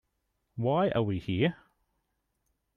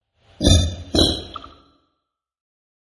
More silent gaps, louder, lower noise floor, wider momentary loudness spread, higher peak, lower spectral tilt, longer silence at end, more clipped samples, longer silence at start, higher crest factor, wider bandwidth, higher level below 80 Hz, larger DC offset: neither; second, -29 LUFS vs -18 LUFS; about the same, -79 dBFS vs -78 dBFS; second, 6 LU vs 18 LU; second, -14 dBFS vs -2 dBFS; first, -9 dB/octave vs -4.5 dB/octave; second, 1.25 s vs 1.45 s; neither; first, 0.55 s vs 0.4 s; about the same, 18 dB vs 20 dB; second, 6.6 kHz vs 11.5 kHz; second, -62 dBFS vs -32 dBFS; neither